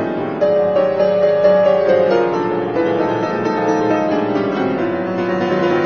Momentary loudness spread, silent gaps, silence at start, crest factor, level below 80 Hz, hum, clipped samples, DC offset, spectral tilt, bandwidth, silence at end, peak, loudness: 6 LU; none; 0 s; 14 dB; -58 dBFS; none; under 0.1%; 0.2%; -7 dB/octave; 6.8 kHz; 0 s; -2 dBFS; -16 LUFS